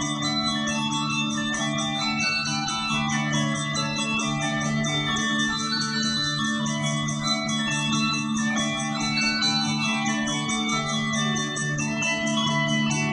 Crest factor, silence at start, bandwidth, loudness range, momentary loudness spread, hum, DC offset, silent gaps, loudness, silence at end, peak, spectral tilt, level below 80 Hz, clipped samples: 14 dB; 0 s; 10.5 kHz; 1 LU; 3 LU; none; under 0.1%; none; -24 LUFS; 0 s; -12 dBFS; -3 dB/octave; -52 dBFS; under 0.1%